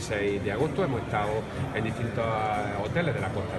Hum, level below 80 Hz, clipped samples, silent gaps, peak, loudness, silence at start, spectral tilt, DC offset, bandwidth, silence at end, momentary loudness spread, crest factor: none; -48 dBFS; under 0.1%; none; -14 dBFS; -29 LUFS; 0 s; -6.5 dB/octave; under 0.1%; 12.5 kHz; 0 s; 3 LU; 16 dB